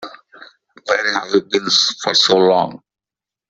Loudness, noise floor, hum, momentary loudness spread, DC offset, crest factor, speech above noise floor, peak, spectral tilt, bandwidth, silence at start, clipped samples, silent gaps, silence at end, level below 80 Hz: -15 LUFS; -89 dBFS; none; 12 LU; under 0.1%; 18 dB; 73 dB; 0 dBFS; -2.5 dB/octave; 8 kHz; 0 s; under 0.1%; none; 0.75 s; -62 dBFS